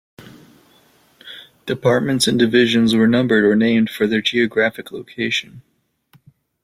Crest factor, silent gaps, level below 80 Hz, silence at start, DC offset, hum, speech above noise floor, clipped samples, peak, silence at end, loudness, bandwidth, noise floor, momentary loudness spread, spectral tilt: 16 dB; none; -58 dBFS; 1.25 s; under 0.1%; none; 40 dB; under 0.1%; -2 dBFS; 1.05 s; -16 LUFS; 15.5 kHz; -56 dBFS; 18 LU; -5 dB/octave